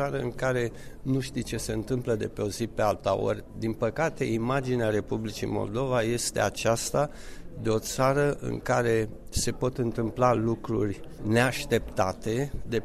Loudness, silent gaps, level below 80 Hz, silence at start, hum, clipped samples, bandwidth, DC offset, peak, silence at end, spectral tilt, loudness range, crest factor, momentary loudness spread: -28 LUFS; none; -44 dBFS; 0 s; none; under 0.1%; 15 kHz; under 0.1%; -10 dBFS; 0 s; -5 dB/octave; 2 LU; 18 dB; 8 LU